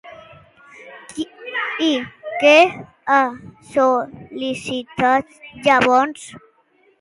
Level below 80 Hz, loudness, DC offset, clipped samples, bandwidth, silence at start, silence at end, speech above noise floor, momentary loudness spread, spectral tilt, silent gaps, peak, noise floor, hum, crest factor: -58 dBFS; -18 LUFS; under 0.1%; under 0.1%; 11.5 kHz; 0.05 s; 0.6 s; 41 dB; 20 LU; -4 dB/octave; none; 0 dBFS; -58 dBFS; none; 20 dB